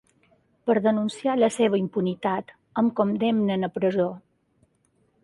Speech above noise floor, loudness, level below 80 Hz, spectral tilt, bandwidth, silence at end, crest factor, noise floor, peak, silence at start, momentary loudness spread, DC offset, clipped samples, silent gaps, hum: 44 dB; -24 LUFS; -68 dBFS; -6.5 dB/octave; 11.5 kHz; 1.05 s; 18 dB; -67 dBFS; -8 dBFS; 0.65 s; 8 LU; under 0.1%; under 0.1%; none; none